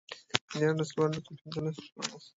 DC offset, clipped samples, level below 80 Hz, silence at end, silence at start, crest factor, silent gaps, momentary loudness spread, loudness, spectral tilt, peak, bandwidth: under 0.1%; under 0.1%; -68 dBFS; 0.1 s; 0.1 s; 32 dB; 0.41-0.48 s, 1.92-1.96 s; 9 LU; -33 LUFS; -5 dB/octave; -2 dBFS; 8 kHz